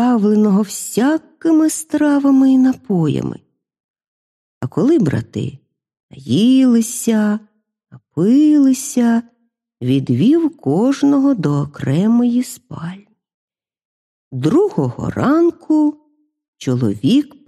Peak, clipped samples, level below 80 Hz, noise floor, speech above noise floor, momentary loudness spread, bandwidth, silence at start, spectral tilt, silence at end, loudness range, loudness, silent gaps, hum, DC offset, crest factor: -2 dBFS; under 0.1%; -54 dBFS; -45 dBFS; 30 dB; 13 LU; 14 kHz; 0 s; -6.5 dB/octave; 0.2 s; 5 LU; -15 LUFS; 3.80-3.94 s, 4.07-4.61 s, 6.00-6.09 s, 13.34-13.48 s, 13.85-14.31 s, 16.48-16.53 s; none; under 0.1%; 14 dB